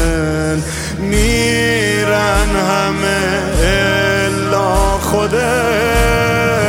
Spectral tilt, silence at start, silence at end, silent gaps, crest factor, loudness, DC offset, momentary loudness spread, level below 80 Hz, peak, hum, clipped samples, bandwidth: -4.5 dB/octave; 0 s; 0 s; none; 12 dB; -14 LUFS; under 0.1%; 4 LU; -22 dBFS; 0 dBFS; none; under 0.1%; 16.5 kHz